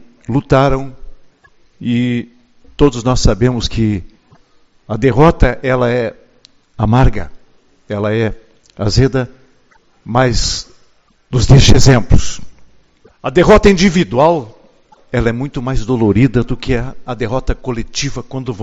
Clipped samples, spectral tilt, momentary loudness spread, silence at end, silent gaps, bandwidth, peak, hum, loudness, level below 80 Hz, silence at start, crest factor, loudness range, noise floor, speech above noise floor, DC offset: 0.4%; -6 dB/octave; 15 LU; 0 s; none; 8 kHz; 0 dBFS; none; -14 LUFS; -22 dBFS; 0.3 s; 14 dB; 6 LU; -51 dBFS; 39 dB; under 0.1%